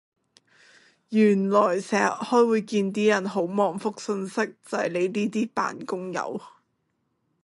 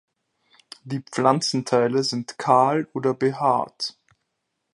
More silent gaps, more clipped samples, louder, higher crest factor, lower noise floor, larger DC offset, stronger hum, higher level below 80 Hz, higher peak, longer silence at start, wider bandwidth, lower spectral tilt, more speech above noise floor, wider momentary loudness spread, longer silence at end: neither; neither; second, -25 LUFS vs -22 LUFS; about the same, 20 dB vs 22 dB; second, -74 dBFS vs -78 dBFS; neither; neither; about the same, -74 dBFS vs -72 dBFS; second, -6 dBFS vs -2 dBFS; first, 1.1 s vs 0.85 s; about the same, 11.5 kHz vs 11.5 kHz; about the same, -5.5 dB/octave vs -5 dB/octave; second, 50 dB vs 56 dB; about the same, 10 LU vs 12 LU; about the same, 0.95 s vs 0.85 s